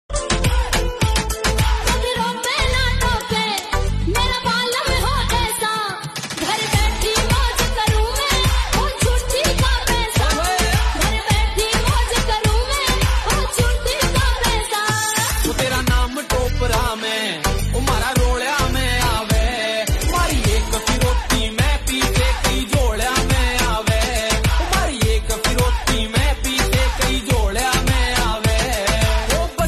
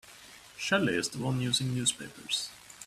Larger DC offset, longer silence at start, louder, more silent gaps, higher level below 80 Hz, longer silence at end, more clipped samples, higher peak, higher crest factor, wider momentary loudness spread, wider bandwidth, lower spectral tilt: neither; about the same, 0.1 s vs 0.05 s; first, -18 LUFS vs -30 LUFS; neither; first, -22 dBFS vs -64 dBFS; about the same, 0 s vs 0 s; neither; first, -2 dBFS vs -12 dBFS; about the same, 16 dB vs 20 dB; second, 3 LU vs 18 LU; second, 13.5 kHz vs 15 kHz; about the same, -3.5 dB/octave vs -3.5 dB/octave